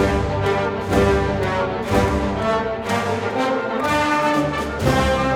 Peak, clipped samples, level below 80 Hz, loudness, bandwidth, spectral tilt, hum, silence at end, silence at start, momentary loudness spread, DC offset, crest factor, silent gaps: -4 dBFS; under 0.1%; -32 dBFS; -20 LUFS; 17.5 kHz; -6 dB/octave; none; 0 s; 0 s; 4 LU; under 0.1%; 16 dB; none